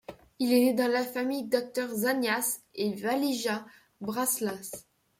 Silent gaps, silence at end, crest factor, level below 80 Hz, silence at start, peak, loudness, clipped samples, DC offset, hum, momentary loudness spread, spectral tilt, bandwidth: none; 0.4 s; 18 dB; -72 dBFS; 0.1 s; -12 dBFS; -29 LUFS; under 0.1%; under 0.1%; none; 13 LU; -3 dB/octave; 16.5 kHz